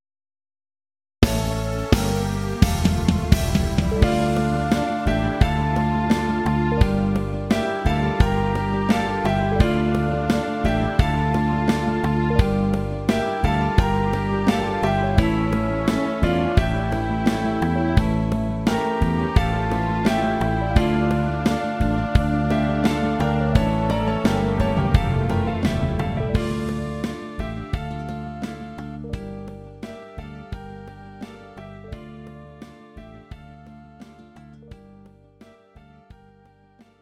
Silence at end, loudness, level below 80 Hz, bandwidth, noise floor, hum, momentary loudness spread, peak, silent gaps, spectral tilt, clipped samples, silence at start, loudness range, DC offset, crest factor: 1.55 s; -22 LUFS; -30 dBFS; 16 kHz; -54 dBFS; none; 17 LU; 0 dBFS; none; -7 dB/octave; under 0.1%; 1.2 s; 15 LU; under 0.1%; 22 dB